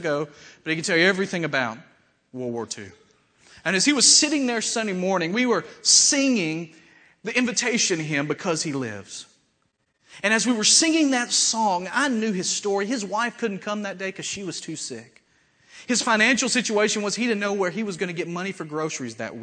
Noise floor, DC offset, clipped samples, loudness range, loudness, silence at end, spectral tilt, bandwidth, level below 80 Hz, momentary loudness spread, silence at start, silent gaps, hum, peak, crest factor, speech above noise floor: -71 dBFS; under 0.1%; under 0.1%; 7 LU; -22 LUFS; 0 s; -2 dB/octave; 9.4 kHz; -72 dBFS; 16 LU; 0 s; none; none; -4 dBFS; 20 dB; 47 dB